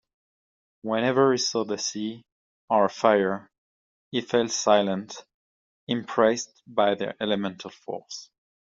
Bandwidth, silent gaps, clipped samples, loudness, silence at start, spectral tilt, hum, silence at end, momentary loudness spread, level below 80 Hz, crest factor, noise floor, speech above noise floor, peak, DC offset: 7.8 kHz; 2.32-2.68 s, 3.58-4.11 s, 5.34-5.87 s; under 0.1%; -25 LUFS; 0.85 s; -3.5 dB/octave; none; 0.35 s; 18 LU; -70 dBFS; 22 dB; under -90 dBFS; over 65 dB; -4 dBFS; under 0.1%